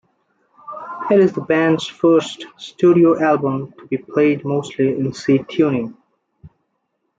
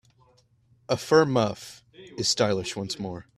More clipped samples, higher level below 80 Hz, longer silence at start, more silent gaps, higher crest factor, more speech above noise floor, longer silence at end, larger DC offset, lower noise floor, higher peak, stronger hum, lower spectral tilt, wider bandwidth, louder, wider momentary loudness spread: neither; about the same, -62 dBFS vs -62 dBFS; second, 0.65 s vs 0.9 s; neither; second, 14 dB vs 22 dB; first, 55 dB vs 38 dB; first, 0.7 s vs 0.15 s; neither; first, -71 dBFS vs -63 dBFS; about the same, -4 dBFS vs -6 dBFS; neither; first, -7 dB/octave vs -4 dB/octave; second, 7.8 kHz vs 14 kHz; first, -17 LUFS vs -25 LUFS; about the same, 17 LU vs 18 LU